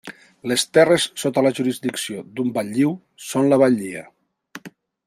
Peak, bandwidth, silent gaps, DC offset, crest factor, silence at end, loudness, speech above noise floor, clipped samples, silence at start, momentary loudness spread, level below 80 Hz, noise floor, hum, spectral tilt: -2 dBFS; 15.5 kHz; none; under 0.1%; 18 dB; 0.4 s; -20 LUFS; 24 dB; under 0.1%; 0.05 s; 19 LU; -64 dBFS; -44 dBFS; none; -4.5 dB/octave